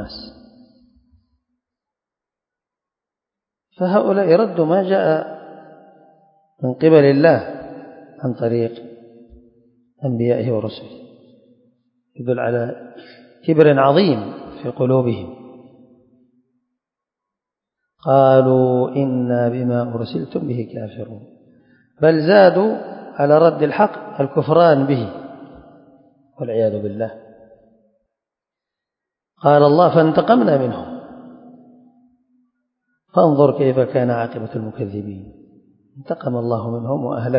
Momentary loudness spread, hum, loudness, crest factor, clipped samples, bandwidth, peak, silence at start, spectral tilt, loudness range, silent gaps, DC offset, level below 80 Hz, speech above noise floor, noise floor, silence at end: 19 LU; none; -17 LUFS; 18 dB; under 0.1%; 5.4 kHz; 0 dBFS; 0 s; -11 dB/octave; 9 LU; none; under 0.1%; -58 dBFS; 71 dB; -87 dBFS; 0 s